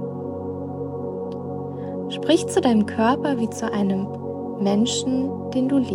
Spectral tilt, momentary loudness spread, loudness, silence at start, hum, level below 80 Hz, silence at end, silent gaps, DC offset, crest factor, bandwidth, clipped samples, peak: -5.5 dB/octave; 11 LU; -23 LUFS; 0 s; none; -60 dBFS; 0 s; none; under 0.1%; 16 dB; 14.5 kHz; under 0.1%; -6 dBFS